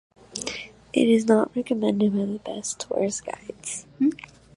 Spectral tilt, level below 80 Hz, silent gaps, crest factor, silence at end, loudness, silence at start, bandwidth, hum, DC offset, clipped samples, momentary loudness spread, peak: -5 dB/octave; -62 dBFS; none; 20 dB; 0.3 s; -25 LUFS; 0.35 s; 11.5 kHz; none; under 0.1%; under 0.1%; 15 LU; -6 dBFS